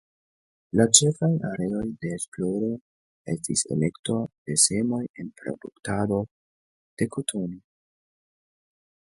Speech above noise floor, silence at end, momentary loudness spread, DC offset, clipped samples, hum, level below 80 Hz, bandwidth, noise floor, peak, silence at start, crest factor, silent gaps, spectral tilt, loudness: over 65 dB; 1.6 s; 18 LU; under 0.1%; under 0.1%; none; -58 dBFS; 12 kHz; under -90 dBFS; 0 dBFS; 0.75 s; 28 dB; 2.28-2.32 s, 2.81-3.25 s, 3.99-4.03 s, 4.38-4.45 s, 5.09-5.14 s, 6.31-6.97 s; -4 dB/octave; -24 LUFS